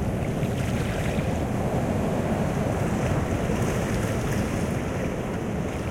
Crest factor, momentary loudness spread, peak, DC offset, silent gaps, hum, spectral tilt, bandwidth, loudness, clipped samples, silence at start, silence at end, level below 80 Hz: 12 dB; 3 LU; -12 dBFS; under 0.1%; none; none; -6.5 dB/octave; 16.5 kHz; -26 LUFS; under 0.1%; 0 s; 0 s; -38 dBFS